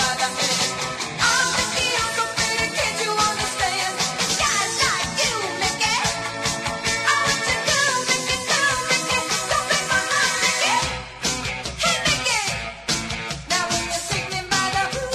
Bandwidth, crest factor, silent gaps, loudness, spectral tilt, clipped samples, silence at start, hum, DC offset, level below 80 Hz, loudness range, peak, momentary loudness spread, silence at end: 13.5 kHz; 18 dB; none; -20 LUFS; -1 dB/octave; under 0.1%; 0 s; none; under 0.1%; -44 dBFS; 2 LU; -4 dBFS; 6 LU; 0 s